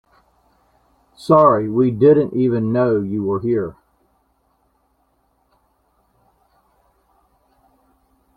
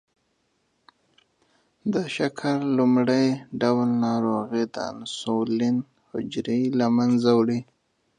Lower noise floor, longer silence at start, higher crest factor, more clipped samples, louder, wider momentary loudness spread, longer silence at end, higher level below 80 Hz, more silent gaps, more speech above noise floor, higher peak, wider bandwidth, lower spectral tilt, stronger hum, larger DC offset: second, -64 dBFS vs -71 dBFS; second, 1.2 s vs 1.85 s; about the same, 20 dB vs 18 dB; neither; first, -16 LUFS vs -24 LUFS; about the same, 9 LU vs 11 LU; first, 4.65 s vs 0.55 s; first, -56 dBFS vs -68 dBFS; neither; about the same, 48 dB vs 48 dB; first, -2 dBFS vs -6 dBFS; about the same, 10.5 kHz vs 9.8 kHz; first, -9.5 dB/octave vs -6.5 dB/octave; neither; neither